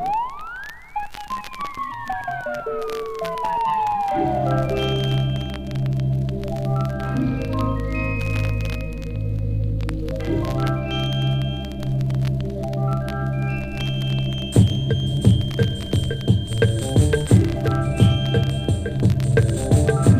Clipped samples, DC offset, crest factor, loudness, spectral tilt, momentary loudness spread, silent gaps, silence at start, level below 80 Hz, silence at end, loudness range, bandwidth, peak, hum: under 0.1%; under 0.1%; 18 dB; -22 LUFS; -6.5 dB/octave; 10 LU; none; 0 s; -32 dBFS; 0 s; 5 LU; 15 kHz; -2 dBFS; none